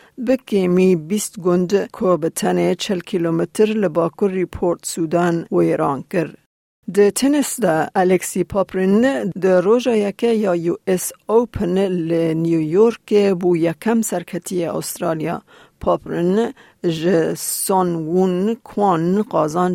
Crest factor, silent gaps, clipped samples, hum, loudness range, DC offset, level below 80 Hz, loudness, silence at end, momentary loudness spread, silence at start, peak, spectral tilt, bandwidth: 14 dB; 6.46-6.83 s; under 0.1%; none; 3 LU; under 0.1%; -50 dBFS; -18 LUFS; 0 s; 7 LU; 0.2 s; -4 dBFS; -5.5 dB/octave; 16.5 kHz